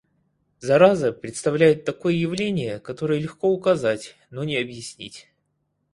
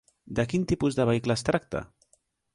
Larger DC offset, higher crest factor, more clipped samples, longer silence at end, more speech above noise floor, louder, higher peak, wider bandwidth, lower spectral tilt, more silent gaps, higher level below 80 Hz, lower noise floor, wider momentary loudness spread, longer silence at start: neither; about the same, 20 dB vs 18 dB; neither; about the same, 0.75 s vs 0.7 s; first, 51 dB vs 42 dB; first, -22 LUFS vs -27 LUFS; first, -2 dBFS vs -10 dBFS; about the same, 11.5 kHz vs 11.5 kHz; about the same, -6 dB/octave vs -6 dB/octave; neither; second, -60 dBFS vs -50 dBFS; first, -73 dBFS vs -69 dBFS; first, 18 LU vs 10 LU; first, 0.6 s vs 0.25 s